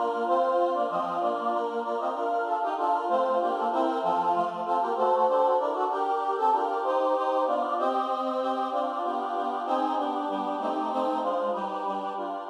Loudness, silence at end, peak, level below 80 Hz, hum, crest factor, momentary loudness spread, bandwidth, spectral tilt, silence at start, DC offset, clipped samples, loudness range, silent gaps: -27 LUFS; 0 s; -12 dBFS; -88 dBFS; none; 14 dB; 5 LU; 10.5 kHz; -5.5 dB/octave; 0 s; under 0.1%; under 0.1%; 3 LU; none